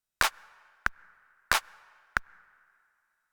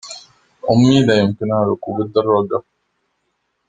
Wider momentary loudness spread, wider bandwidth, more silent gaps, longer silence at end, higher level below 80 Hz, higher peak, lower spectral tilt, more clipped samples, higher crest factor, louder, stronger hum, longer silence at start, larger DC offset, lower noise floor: second, 5 LU vs 14 LU; first, over 20 kHz vs 9.4 kHz; neither; about the same, 1.1 s vs 1.1 s; about the same, -52 dBFS vs -52 dBFS; about the same, -4 dBFS vs -2 dBFS; second, -0.5 dB/octave vs -6.5 dB/octave; neither; first, 32 dB vs 16 dB; second, -31 LUFS vs -16 LUFS; neither; first, 0.2 s vs 0.05 s; neither; first, -74 dBFS vs -70 dBFS